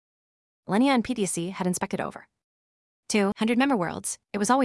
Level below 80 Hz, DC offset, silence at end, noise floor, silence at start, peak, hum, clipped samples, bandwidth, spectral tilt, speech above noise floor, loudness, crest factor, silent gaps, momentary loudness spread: -62 dBFS; under 0.1%; 0 s; under -90 dBFS; 0.7 s; -8 dBFS; none; under 0.1%; 12 kHz; -4.5 dB/octave; over 65 dB; -26 LUFS; 18 dB; 2.44-3.03 s; 9 LU